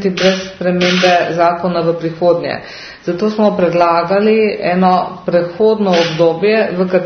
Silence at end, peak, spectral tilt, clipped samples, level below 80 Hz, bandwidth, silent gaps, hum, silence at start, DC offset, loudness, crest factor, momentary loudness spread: 0 s; 0 dBFS; -6 dB/octave; under 0.1%; -52 dBFS; 6.6 kHz; none; none; 0 s; under 0.1%; -13 LUFS; 12 dB; 6 LU